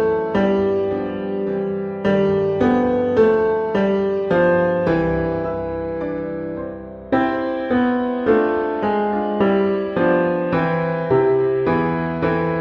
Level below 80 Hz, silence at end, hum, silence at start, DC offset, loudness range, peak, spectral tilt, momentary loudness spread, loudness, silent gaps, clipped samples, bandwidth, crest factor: -44 dBFS; 0 s; none; 0 s; under 0.1%; 4 LU; -4 dBFS; -9 dB/octave; 8 LU; -19 LUFS; none; under 0.1%; 6.4 kHz; 16 dB